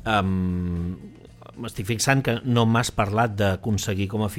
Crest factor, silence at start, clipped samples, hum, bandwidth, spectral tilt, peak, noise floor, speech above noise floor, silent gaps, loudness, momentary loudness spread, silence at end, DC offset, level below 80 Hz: 18 dB; 0 s; under 0.1%; none; 16.5 kHz; -5.5 dB/octave; -4 dBFS; -45 dBFS; 22 dB; none; -23 LUFS; 12 LU; 0 s; under 0.1%; -46 dBFS